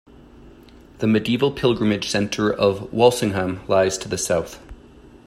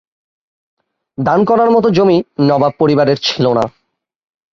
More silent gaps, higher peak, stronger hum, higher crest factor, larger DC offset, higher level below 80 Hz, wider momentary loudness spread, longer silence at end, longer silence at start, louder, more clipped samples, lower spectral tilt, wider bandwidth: neither; about the same, -2 dBFS vs -2 dBFS; neither; first, 20 dB vs 12 dB; neither; about the same, -48 dBFS vs -52 dBFS; about the same, 7 LU vs 7 LU; second, 0.5 s vs 0.85 s; second, 0.4 s vs 1.2 s; second, -20 LUFS vs -13 LUFS; neither; second, -5 dB/octave vs -6.5 dB/octave; first, 15.5 kHz vs 7.4 kHz